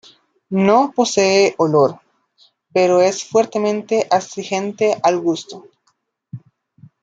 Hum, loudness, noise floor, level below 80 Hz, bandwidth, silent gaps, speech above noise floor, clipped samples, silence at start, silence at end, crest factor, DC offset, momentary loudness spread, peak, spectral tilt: none; -17 LUFS; -66 dBFS; -64 dBFS; 9.2 kHz; none; 50 dB; under 0.1%; 0.5 s; 0.65 s; 16 dB; under 0.1%; 12 LU; -2 dBFS; -4.5 dB/octave